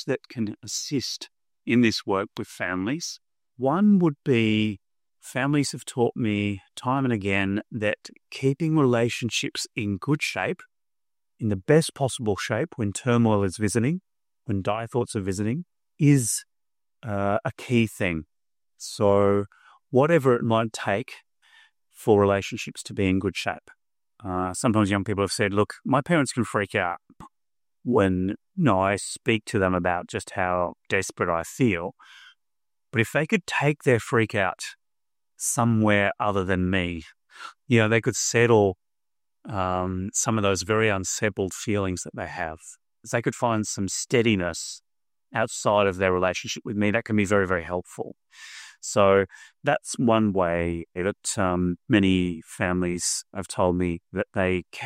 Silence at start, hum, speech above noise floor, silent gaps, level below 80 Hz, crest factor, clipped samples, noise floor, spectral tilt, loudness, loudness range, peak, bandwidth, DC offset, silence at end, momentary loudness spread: 0 s; none; over 66 dB; none; -56 dBFS; 20 dB; under 0.1%; under -90 dBFS; -5 dB/octave; -25 LUFS; 3 LU; -6 dBFS; 15.5 kHz; under 0.1%; 0 s; 12 LU